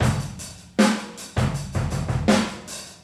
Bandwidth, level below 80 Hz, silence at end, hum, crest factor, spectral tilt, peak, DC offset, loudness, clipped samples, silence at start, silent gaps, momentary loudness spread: 14 kHz; -38 dBFS; 0.1 s; none; 18 dB; -5.5 dB/octave; -6 dBFS; under 0.1%; -24 LUFS; under 0.1%; 0 s; none; 13 LU